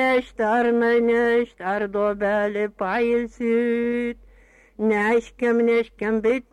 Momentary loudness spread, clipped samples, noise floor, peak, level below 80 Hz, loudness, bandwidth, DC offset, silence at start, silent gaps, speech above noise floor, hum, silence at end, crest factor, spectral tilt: 7 LU; under 0.1%; -53 dBFS; -10 dBFS; -54 dBFS; -22 LUFS; 10 kHz; under 0.1%; 0 s; none; 31 dB; none; 0.1 s; 10 dB; -6.5 dB/octave